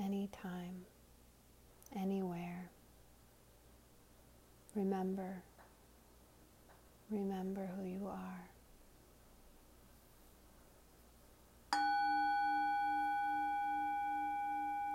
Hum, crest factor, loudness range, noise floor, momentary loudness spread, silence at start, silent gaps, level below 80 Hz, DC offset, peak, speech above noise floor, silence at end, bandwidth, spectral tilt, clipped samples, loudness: none; 22 dB; 11 LU; -65 dBFS; 16 LU; 0 s; none; -68 dBFS; under 0.1%; -20 dBFS; 23 dB; 0 s; 16 kHz; -6 dB/octave; under 0.1%; -40 LUFS